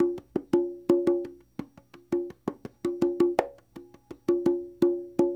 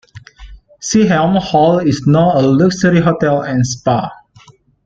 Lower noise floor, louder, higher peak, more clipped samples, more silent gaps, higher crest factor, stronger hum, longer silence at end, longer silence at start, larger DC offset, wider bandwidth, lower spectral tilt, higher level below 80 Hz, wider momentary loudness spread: first, -52 dBFS vs -45 dBFS; second, -28 LUFS vs -13 LUFS; second, -8 dBFS vs 0 dBFS; neither; neither; first, 20 dB vs 12 dB; neither; second, 0 s vs 0.7 s; second, 0 s vs 0.15 s; neither; first, 9 kHz vs 7.8 kHz; first, -7.5 dB/octave vs -6 dB/octave; second, -64 dBFS vs -42 dBFS; first, 16 LU vs 5 LU